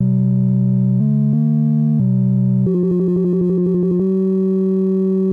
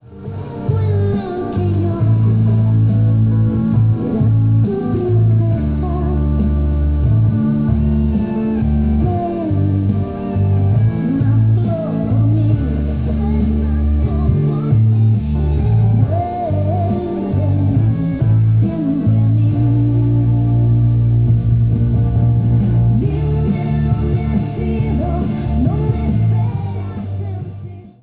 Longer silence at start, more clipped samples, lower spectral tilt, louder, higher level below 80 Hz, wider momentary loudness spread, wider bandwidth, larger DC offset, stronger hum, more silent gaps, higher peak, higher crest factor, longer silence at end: about the same, 0 s vs 0.1 s; neither; first, -13.5 dB/octave vs -11 dB/octave; about the same, -16 LUFS vs -16 LUFS; second, -52 dBFS vs -24 dBFS; second, 1 LU vs 5 LU; second, 1.9 kHz vs 3.8 kHz; neither; neither; neither; second, -8 dBFS vs -2 dBFS; about the same, 8 dB vs 12 dB; second, 0 s vs 0.15 s